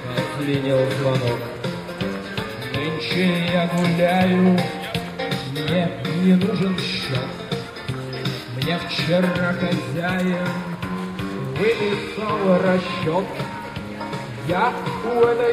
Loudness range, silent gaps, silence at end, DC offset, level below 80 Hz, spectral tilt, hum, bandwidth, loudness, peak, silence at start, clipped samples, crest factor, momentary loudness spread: 3 LU; none; 0 s; under 0.1%; -50 dBFS; -6.5 dB/octave; none; 15 kHz; -22 LUFS; -4 dBFS; 0 s; under 0.1%; 18 dB; 11 LU